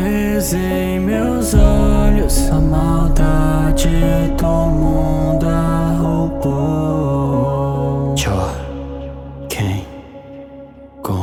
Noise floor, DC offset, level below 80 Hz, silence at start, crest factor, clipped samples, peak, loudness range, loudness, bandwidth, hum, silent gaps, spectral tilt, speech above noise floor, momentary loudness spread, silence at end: -37 dBFS; under 0.1%; -20 dBFS; 0 s; 14 dB; under 0.1%; 0 dBFS; 6 LU; -16 LUFS; 18 kHz; none; none; -6.5 dB/octave; 24 dB; 15 LU; 0 s